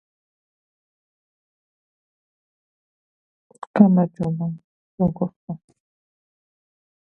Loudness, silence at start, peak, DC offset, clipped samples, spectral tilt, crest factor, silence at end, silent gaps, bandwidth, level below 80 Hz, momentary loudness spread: -21 LUFS; 3.75 s; 0 dBFS; under 0.1%; under 0.1%; -11 dB/octave; 26 dB; 1.45 s; 4.64-4.98 s, 5.36-5.48 s; 4.3 kHz; -58 dBFS; 21 LU